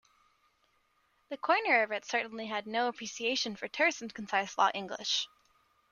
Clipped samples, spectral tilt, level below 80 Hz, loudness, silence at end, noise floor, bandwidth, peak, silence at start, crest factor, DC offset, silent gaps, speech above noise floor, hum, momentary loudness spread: under 0.1%; -2 dB/octave; -78 dBFS; -31 LUFS; 0.65 s; -73 dBFS; 10.5 kHz; -14 dBFS; 1.3 s; 20 dB; under 0.1%; none; 41 dB; none; 10 LU